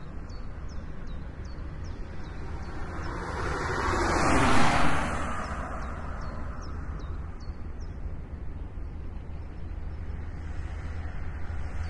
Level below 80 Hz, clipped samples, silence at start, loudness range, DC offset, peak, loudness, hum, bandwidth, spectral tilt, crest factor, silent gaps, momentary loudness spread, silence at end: -38 dBFS; under 0.1%; 0 s; 12 LU; under 0.1%; -8 dBFS; -33 LUFS; none; 11.5 kHz; -5 dB/octave; 20 dB; none; 16 LU; 0 s